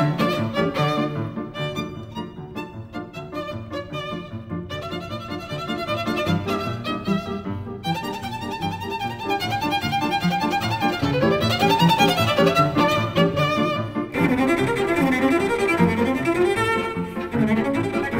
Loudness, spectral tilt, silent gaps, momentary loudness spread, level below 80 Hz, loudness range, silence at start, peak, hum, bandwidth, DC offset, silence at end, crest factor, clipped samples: -22 LUFS; -6 dB/octave; none; 13 LU; -48 dBFS; 12 LU; 0 s; -6 dBFS; none; 16 kHz; under 0.1%; 0 s; 18 dB; under 0.1%